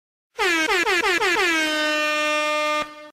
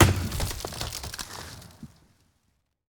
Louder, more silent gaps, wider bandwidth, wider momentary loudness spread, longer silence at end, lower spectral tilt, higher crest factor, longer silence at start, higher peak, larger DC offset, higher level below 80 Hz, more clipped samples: first, -20 LUFS vs -30 LUFS; neither; second, 16 kHz vs over 20 kHz; second, 5 LU vs 19 LU; second, 0 s vs 1.05 s; second, -0.5 dB/octave vs -4.5 dB/octave; second, 12 dB vs 24 dB; first, 0.4 s vs 0 s; second, -10 dBFS vs -4 dBFS; neither; second, -56 dBFS vs -40 dBFS; neither